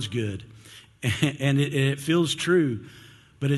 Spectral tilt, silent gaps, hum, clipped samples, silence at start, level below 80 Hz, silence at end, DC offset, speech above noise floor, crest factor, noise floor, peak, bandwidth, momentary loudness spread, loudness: -5.5 dB/octave; none; none; under 0.1%; 0 s; -52 dBFS; 0 s; under 0.1%; 25 dB; 18 dB; -49 dBFS; -6 dBFS; 12.5 kHz; 12 LU; -25 LUFS